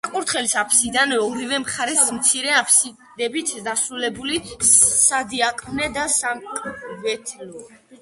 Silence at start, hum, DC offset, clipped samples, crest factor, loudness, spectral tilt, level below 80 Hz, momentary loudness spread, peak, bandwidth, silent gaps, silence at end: 0.05 s; none; under 0.1%; under 0.1%; 20 dB; -18 LUFS; -0.5 dB/octave; -54 dBFS; 14 LU; 0 dBFS; 12 kHz; none; 0.05 s